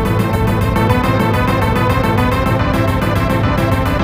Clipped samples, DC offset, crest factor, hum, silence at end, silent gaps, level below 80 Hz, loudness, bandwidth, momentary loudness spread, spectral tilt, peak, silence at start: under 0.1%; 0.5%; 14 dB; none; 0 s; none; -24 dBFS; -15 LUFS; 16 kHz; 1 LU; -7 dB/octave; 0 dBFS; 0 s